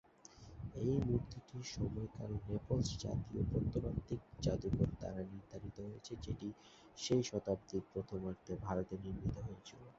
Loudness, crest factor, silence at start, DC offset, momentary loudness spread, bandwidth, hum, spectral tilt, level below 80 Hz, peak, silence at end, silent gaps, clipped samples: -42 LUFS; 20 dB; 0.3 s; under 0.1%; 13 LU; 7.6 kHz; none; -7.5 dB/octave; -54 dBFS; -20 dBFS; 0.05 s; none; under 0.1%